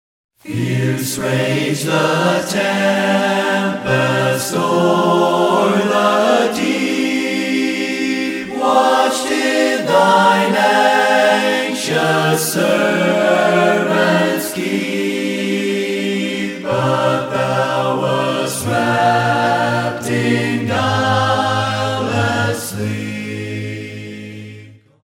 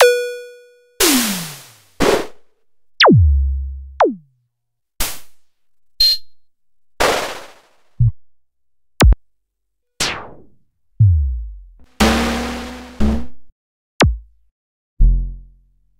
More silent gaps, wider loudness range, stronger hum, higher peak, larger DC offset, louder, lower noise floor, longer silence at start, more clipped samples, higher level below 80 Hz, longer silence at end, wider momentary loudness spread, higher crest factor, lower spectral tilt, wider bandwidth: second, none vs 13.52-13.99 s, 14.51-14.97 s; about the same, 4 LU vs 5 LU; neither; about the same, -2 dBFS vs 0 dBFS; neither; about the same, -16 LUFS vs -17 LUFS; second, -40 dBFS vs -78 dBFS; first, 0.45 s vs 0 s; neither; second, -58 dBFS vs -24 dBFS; second, 0.3 s vs 0.55 s; second, 8 LU vs 18 LU; about the same, 14 dB vs 18 dB; about the same, -4.5 dB/octave vs -4.5 dB/octave; about the same, 16.5 kHz vs 16 kHz